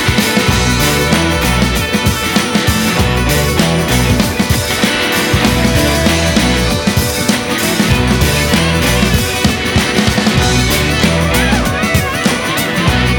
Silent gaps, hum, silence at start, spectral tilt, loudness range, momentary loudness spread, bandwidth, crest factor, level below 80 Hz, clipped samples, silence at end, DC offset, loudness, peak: none; none; 0 s; -4 dB/octave; 1 LU; 2 LU; over 20 kHz; 12 dB; -22 dBFS; under 0.1%; 0 s; under 0.1%; -12 LUFS; 0 dBFS